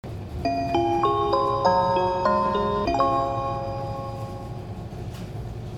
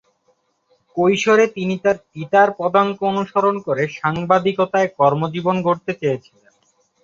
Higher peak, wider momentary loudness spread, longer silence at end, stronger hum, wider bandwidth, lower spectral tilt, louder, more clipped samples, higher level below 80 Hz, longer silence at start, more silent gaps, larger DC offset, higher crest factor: second, -8 dBFS vs -2 dBFS; first, 14 LU vs 7 LU; second, 0 s vs 0.85 s; neither; first, 14 kHz vs 7.6 kHz; about the same, -7 dB/octave vs -6 dB/octave; second, -24 LUFS vs -18 LUFS; neither; first, -42 dBFS vs -60 dBFS; second, 0.05 s vs 0.95 s; neither; neither; about the same, 18 dB vs 16 dB